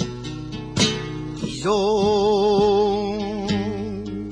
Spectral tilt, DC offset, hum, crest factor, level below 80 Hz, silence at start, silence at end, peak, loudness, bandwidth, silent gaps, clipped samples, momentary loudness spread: -5 dB/octave; under 0.1%; none; 16 dB; -42 dBFS; 0 s; 0 s; -4 dBFS; -21 LUFS; 10.5 kHz; none; under 0.1%; 12 LU